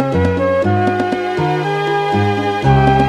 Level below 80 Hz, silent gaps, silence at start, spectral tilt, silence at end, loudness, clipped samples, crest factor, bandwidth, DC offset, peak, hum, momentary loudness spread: -32 dBFS; none; 0 s; -7.5 dB/octave; 0 s; -15 LUFS; under 0.1%; 14 dB; 11 kHz; under 0.1%; 0 dBFS; none; 4 LU